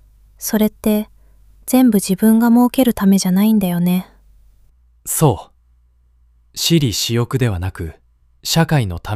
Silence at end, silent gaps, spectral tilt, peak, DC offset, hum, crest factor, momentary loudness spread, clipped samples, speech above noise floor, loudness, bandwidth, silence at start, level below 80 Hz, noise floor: 0 s; none; -5.5 dB/octave; -2 dBFS; under 0.1%; none; 16 dB; 14 LU; under 0.1%; 39 dB; -16 LUFS; 16 kHz; 0.4 s; -42 dBFS; -54 dBFS